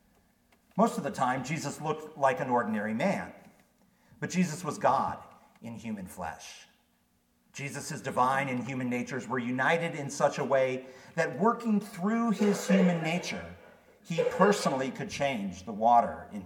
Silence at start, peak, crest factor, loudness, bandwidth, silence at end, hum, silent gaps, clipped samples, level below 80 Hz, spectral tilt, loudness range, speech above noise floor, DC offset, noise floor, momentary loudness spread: 0.75 s; -8 dBFS; 22 dB; -30 LUFS; 17 kHz; 0 s; none; none; under 0.1%; -68 dBFS; -5.5 dB/octave; 6 LU; 41 dB; under 0.1%; -70 dBFS; 14 LU